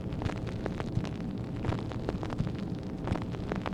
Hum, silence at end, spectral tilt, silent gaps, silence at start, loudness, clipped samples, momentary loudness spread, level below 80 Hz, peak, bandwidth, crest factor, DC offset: none; 0 s; -7.5 dB/octave; none; 0 s; -35 LUFS; under 0.1%; 3 LU; -44 dBFS; -14 dBFS; 11 kHz; 20 dB; under 0.1%